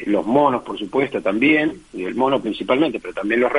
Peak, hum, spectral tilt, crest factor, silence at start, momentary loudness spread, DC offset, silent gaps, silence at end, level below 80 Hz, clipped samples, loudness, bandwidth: -2 dBFS; none; -6.5 dB/octave; 16 dB; 0 s; 9 LU; under 0.1%; none; 0 s; -54 dBFS; under 0.1%; -19 LUFS; 10.5 kHz